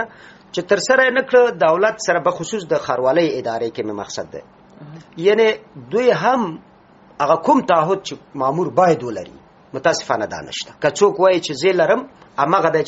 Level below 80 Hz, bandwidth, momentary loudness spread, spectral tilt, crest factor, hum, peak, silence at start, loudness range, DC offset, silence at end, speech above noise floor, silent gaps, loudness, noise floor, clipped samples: -60 dBFS; 8 kHz; 14 LU; -3 dB/octave; 18 dB; none; 0 dBFS; 0 s; 4 LU; under 0.1%; 0 s; 30 dB; none; -18 LUFS; -48 dBFS; under 0.1%